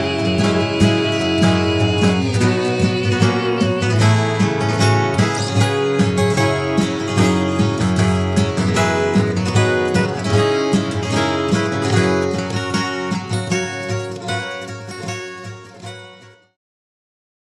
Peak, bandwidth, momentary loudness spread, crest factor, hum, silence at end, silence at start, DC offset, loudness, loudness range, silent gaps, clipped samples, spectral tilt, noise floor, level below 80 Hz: -2 dBFS; 12 kHz; 9 LU; 16 dB; none; 1.3 s; 0 s; under 0.1%; -17 LUFS; 8 LU; none; under 0.1%; -5.5 dB/octave; -43 dBFS; -46 dBFS